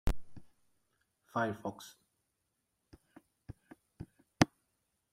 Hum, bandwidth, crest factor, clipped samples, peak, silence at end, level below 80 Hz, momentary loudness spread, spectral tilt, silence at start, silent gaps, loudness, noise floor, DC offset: none; 16 kHz; 30 dB; under 0.1%; -8 dBFS; 0.65 s; -48 dBFS; 23 LU; -5 dB/octave; 0.05 s; none; -36 LUFS; -83 dBFS; under 0.1%